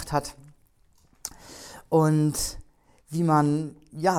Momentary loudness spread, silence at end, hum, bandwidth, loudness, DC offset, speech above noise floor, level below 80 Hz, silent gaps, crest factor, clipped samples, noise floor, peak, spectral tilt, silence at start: 21 LU; 0 s; none; 16.5 kHz; -25 LUFS; under 0.1%; 37 dB; -50 dBFS; none; 18 dB; under 0.1%; -61 dBFS; -8 dBFS; -6 dB/octave; 0 s